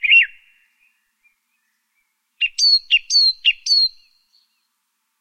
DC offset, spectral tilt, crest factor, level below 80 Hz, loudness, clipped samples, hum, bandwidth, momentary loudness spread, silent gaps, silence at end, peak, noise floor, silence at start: under 0.1%; 8.5 dB/octave; 18 dB; -66 dBFS; -14 LUFS; under 0.1%; none; 13.5 kHz; 9 LU; none; 1.3 s; -4 dBFS; -72 dBFS; 0.05 s